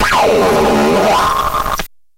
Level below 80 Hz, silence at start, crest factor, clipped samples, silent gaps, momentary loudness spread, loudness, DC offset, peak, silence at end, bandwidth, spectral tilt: -30 dBFS; 0 s; 10 dB; under 0.1%; none; 7 LU; -12 LUFS; under 0.1%; -2 dBFS; 0.3 s; 16 kHz; -4 dB/octave